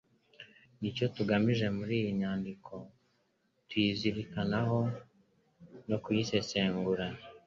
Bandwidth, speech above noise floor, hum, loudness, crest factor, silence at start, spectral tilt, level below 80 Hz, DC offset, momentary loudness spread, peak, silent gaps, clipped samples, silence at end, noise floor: 7.4 kHz; 43 dB; none; -33 LUFS; 20 dB; 0.4 s; -6.5 dB/octave; -62 dBFS; under 0.1%; 18 LU; -14 dBFS; none; under 0.1%; 0.1 s; -76 dBFS